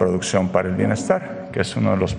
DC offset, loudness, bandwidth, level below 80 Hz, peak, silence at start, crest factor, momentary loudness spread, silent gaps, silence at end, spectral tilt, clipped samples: under 0.1%; -21 LUFS; 11 kHz; -46 dBFS; -4 dBFS; 0 s; 18 dB; 5 LU; none; 0 s; -6 dB/octave; under 0.1%